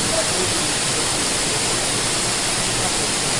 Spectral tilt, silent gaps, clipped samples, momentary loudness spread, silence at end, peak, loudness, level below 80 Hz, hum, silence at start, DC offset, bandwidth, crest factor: -1.5 dB/octave; none; under 0.1%; 1 LU; 0 s; -8 dBFS; -18 LUFS; -40 dBFS; none; 0 s; under 0.1%; 11.5 kHz; 12 dB